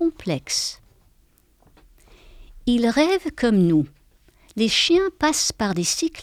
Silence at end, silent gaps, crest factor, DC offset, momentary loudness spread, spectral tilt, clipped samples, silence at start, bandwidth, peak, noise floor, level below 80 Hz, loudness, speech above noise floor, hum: 0 s; none; 16 dB; under 0.1%; 11 LU; -4 dB/octave; under 0.1%; 0 s; 15.5 kHz; -6 dBFS; -59 dBFS; -48 dBFS; -21 LUFS; 38 dB; none